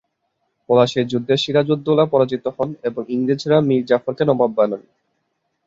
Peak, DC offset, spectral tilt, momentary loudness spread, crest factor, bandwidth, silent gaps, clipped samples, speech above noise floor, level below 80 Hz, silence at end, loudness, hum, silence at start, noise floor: -2 dBFS; under 0.1%; -6.5 dB/octave; 7 LU; 16 dB; 7.8 kHz; none; under 0.1%; 54 dB; -60 dBFS; 0.85 s; -18 LUFS; none; 0.7 s; -71 dBFS